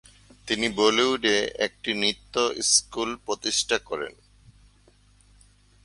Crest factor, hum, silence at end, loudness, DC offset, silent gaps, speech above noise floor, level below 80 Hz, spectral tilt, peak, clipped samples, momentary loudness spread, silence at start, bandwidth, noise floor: 22 dB; 50 Hz at -55 dBFS; 1.75 s; -24 LUFS; under 0.1%; none; 33 dB; -56 dBFS; -1 dB/octave; -6 dBFS; under 0.1%; 11 LU; 0.45 s; 11.5 kHz; -58 dBFS